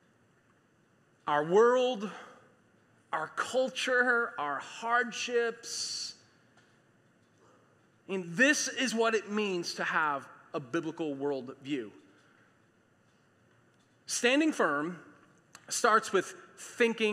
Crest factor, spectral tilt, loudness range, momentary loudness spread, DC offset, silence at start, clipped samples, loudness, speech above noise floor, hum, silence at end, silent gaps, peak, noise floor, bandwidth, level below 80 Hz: 22 dB; -3 dB/octave; 8 LU; 15 LU; under 0.1%; 1.25 s; under 0.1%; -30 LUFS; 37 dB; none; 0 s; none; -12 dBFS; -67 dBFS; 14.5 kHz; -88 dBFS